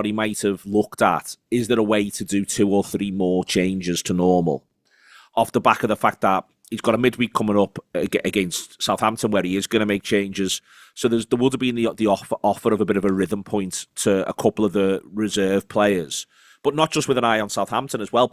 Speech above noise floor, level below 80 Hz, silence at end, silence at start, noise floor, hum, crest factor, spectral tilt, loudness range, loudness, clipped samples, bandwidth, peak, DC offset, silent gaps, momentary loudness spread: 32 dB; -54 dBFS; 0.05 s; 0 s; -53 dBFS; none; 20 dB; -4.5 dB/octave; 1 LU; -21 LUFS; under 0.1%; 16 kHz; 0 dBFS; under 0.1%; none; 6 LU